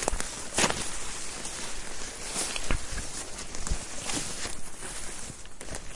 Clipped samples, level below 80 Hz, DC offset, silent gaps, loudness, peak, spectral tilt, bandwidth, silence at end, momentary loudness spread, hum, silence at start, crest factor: under 0.1%; -40 dBFS; under 0.1%; none; -33 LUFS; -6 dBFS; -2 dB/octave; 11.5 kHz; 0 s; 12 LU; none; 0 s; 26 dB